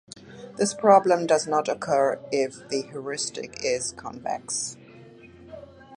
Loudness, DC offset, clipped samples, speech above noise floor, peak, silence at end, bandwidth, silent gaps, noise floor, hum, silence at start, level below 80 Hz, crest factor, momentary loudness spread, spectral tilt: -25 LUFS; under 0.1%; under 0.1%; 24 dB; -4 dBFS; 0 s; 11.5 kHz; none; -48 dBFS; none; 0.15 s; -64 dBFS; 22 dB; 26 LU; -3.5 dB/octave